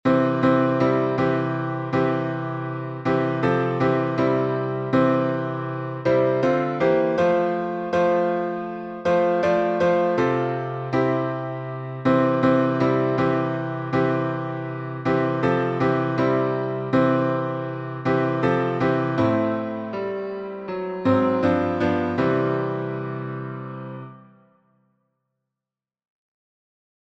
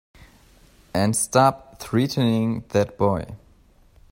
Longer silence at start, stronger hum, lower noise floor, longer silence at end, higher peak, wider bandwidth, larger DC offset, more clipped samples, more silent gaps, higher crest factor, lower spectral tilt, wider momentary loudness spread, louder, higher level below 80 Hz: second, 0.05 s vs 0.95 s; neither; first, -90 dBFS vs -54 dBFS; first, 2.85 s vs 0.75 s; about the same, -6 dBFS vs -4 dBFS; second, 7.8 kHz vs 16 kHz; neither; neither; neither; about the same, 16 dB vs 20 dB; first, -8.5 dB/octave vs -5.5 dB/octave; about the same, 10 LU vs 11 LU; about the same, -22 LUFS vs -22 LUFS; second, -58 dBFS vs -52 dBFS